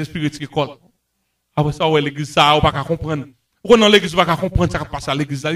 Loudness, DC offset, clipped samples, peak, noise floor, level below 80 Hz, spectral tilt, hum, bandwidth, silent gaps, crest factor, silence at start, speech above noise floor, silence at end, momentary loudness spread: -17 LUFS; under 0.1%; under 0.1%; 0 dBFS; -71 dBFS; -36 dBFS; -5 dB/octave; none; 14 kHz; none; 18 dB; 0 s; 54 dB; 0 s; 12 LU